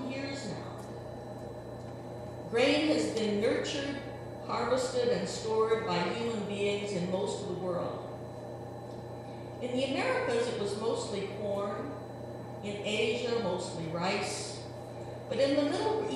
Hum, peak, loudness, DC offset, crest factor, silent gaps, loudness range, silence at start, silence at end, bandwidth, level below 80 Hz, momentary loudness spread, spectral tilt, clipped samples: none; -16 dBFS; -33 LUFS; under 0.1%; 18 dB; none; 4 LU; 0 s; 0 s; 13 kHz; -62 dBFS; 14 LU; -5 dB/octave; under 0.1%